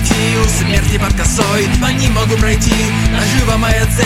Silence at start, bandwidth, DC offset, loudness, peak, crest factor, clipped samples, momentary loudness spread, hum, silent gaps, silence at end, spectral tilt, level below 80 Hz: 0 s; 16 kHz; 0.3%; -13 LUFS; 0 dBFS; 12 dB; under 0.1%; 1 LU; none; none; 0 s; -4.5 dB/octave; -18 dBFS